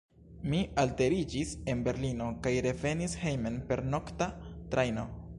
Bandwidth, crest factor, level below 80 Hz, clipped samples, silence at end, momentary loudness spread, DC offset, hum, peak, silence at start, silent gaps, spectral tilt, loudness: 11.5 kHz; 18 dB; -48 dBFS; under 0.1%; 0 s; 6 LU; under 0.1%; none; -16 dBFS; 0.2 s; none; -6 dB/octave; -33 LUFS